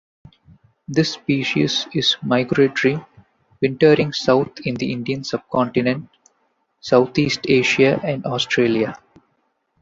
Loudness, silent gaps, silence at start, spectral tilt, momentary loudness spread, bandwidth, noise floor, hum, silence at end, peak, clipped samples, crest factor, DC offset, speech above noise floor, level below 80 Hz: -19 LUFS; none; 0.9 s; -5.5 dB/octave; 9 LU; 7.8 kHz; -68 dBFS; none; 0.85 s; -2 dBFS; under 0.1%; 18 dB; under 0.1%; 49 dB; -56 dBFS